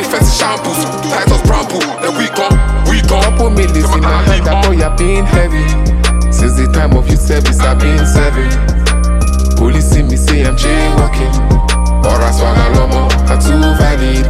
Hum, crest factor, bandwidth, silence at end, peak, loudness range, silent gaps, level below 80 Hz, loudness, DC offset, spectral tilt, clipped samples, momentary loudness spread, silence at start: none; 8 dB; 14.5 kHz; 0 s; 0 dBFS; 1 LU; none; -10 dBFS; -11 LUFS; under 0.1%; -5.5 dB/octave; under 0.1%; 3 LU; 0 s